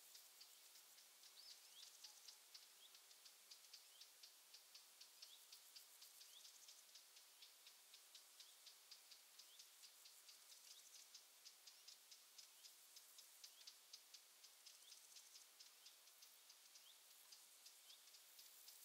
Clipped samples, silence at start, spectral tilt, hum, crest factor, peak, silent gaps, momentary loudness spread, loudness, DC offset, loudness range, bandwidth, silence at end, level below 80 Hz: under 0.1%; 0 s; 4 dB/octave; none; 20 dB; -46 dBFS; none; 3 LU; -63 LUFS; under 0.1%; 1 LU; 16 kHz; 0 s; under -90 dBFS